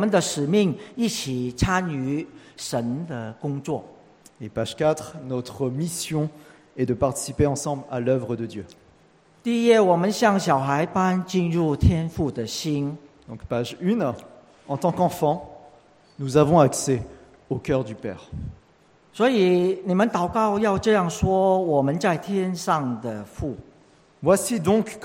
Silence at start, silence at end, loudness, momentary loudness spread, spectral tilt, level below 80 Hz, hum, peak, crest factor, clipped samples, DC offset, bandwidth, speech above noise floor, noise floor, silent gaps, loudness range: 0 s; 0 s; -23 LUFS; 14 LU; -5.5 dB/octave; -44 dBFS; none; -2 dBFS; 20 dB; under 0.1%; under 0.1%; 16.5 kHz; 34 dB; -57 dBFS; none; 7 LU